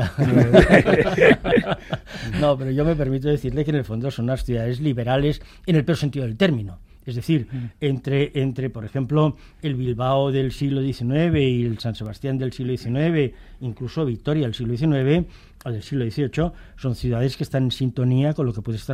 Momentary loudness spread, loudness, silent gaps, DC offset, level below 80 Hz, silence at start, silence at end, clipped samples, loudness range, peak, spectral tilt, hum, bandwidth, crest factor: 13 LU; -22 LUFS; none; under 0.1%; -38 dBFS; 0 s; 0 s; under 0.1%; 4 LU; 0 dBFS; -7.5 dB/octave; none; 13.5 kHz; 20 dB